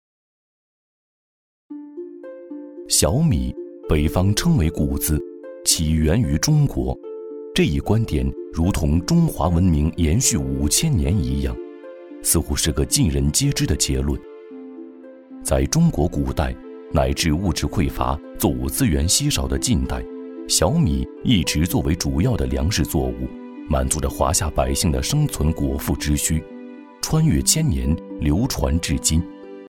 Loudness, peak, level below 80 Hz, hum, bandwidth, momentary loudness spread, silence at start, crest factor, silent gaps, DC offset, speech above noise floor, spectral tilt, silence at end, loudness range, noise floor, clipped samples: -20 LUFS; -2 dBFS; -28 dBFS; none; 17 kHz; 17 LU; 1.7 s; 18 dB; none; under 0.1%; 21 dB; -4.5 dB/octave; 0 s; 3 LU; -41 dBFS; under 0.1%